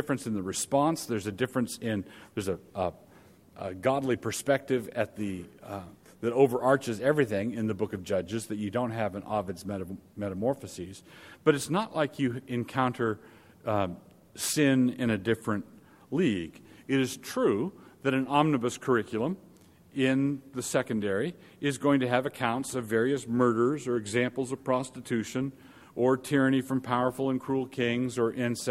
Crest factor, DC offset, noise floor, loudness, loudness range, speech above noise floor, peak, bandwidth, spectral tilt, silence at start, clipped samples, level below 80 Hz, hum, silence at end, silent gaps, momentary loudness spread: 20 dB; under 0.1%; -56 dBFS; -29 LUFS; 4 LU; 27 dB; -8 dBFS; 16 kHz; -5.5 dB/octave; 0 s; under 0.1%; -66 dBFS; none; 0 s; none; 11 LU